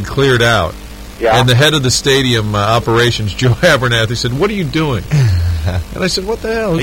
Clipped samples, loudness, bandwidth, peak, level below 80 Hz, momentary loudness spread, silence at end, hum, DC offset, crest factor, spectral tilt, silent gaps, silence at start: under 0.1%; -13 LUFS; 16.5 kHz; 0 dBFS; -28 dBFS; 8 LU; 0 s; none; 0.3%; 12 dB; -4.5 dB/octave; none; 0 s